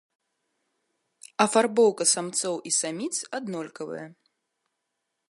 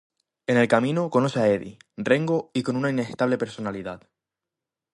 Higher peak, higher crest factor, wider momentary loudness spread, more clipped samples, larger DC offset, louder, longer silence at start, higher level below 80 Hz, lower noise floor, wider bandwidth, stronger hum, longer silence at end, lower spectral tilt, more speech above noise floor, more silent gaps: about the same, -6 dBFS vs -6 dBFS; about the same, 22 dB vs 20 dB; about the same, 16 LU vs 14 LU; neither; neither; about the same, -24 LUFS vs -24 LUFS; first, 1.4 s vs 0.5 s; second, -82 dBFS vs -64 dBFS; second, -81 dBFS vs -87 dBFS; about the same, 11.5 kHz vs 11.5 kHz; neither; first, 1.15 s vs 0.95 s; second, -2.5 dB/octave vs -6.5 dB/octave; second, 56 dB vs 64 dB; neither